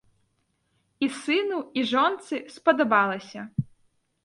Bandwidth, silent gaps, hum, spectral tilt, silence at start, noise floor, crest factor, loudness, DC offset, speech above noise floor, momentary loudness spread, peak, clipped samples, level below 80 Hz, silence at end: 11.5 kHz; none; none; -5.5 dB/octave; 1 s; -72 dBFS; 20 dB; -25 LUFS; under 0.1%; 47 dB; 12 LU; -6 dBFS; under 0.1%; -64 dBFS; 0.6 s